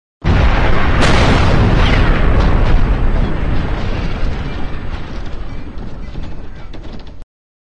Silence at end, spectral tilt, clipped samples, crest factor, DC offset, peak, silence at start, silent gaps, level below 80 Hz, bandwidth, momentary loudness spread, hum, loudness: 0.45 s; -6.5 dB/octave; under 0.1%; 12 dB; under 0.1%; 0 dBFS; 0.2 s; none; -16 dBFS; 9.6 kHz; 19 LU; none; -15 LUFS